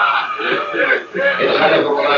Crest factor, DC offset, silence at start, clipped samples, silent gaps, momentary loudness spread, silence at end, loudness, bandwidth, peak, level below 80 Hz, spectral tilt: 14 dB; under 0.1%; 0 s; under 0.1%; none; 5 LU; 0 s; -15 LUFS; 7.2 kHz; -2 dBFS; -64 dBFS; -0.5 dB/octave